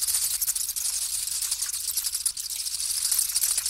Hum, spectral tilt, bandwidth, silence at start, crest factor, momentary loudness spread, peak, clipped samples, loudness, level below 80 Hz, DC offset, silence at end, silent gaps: none; 4 dB/octave; 16.5 kHz; 0 s; 18 dB; 5 LU; -10 dBFS; under 0.1%; -25 LUFS; -58 dBFS; under 0.1%; 0 s; none